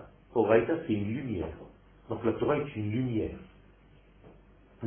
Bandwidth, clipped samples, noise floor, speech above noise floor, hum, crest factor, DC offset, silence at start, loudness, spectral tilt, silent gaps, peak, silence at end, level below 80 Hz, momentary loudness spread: 3.5 kHz; under 0.1%; -58 dBFS; 29 dB; none; 22 dB; under 0.1%; 0 s; -31 LUFS; -11.5 dB/octave; none; -10 dBFS; 0 s; -54 dBFS; 15 LU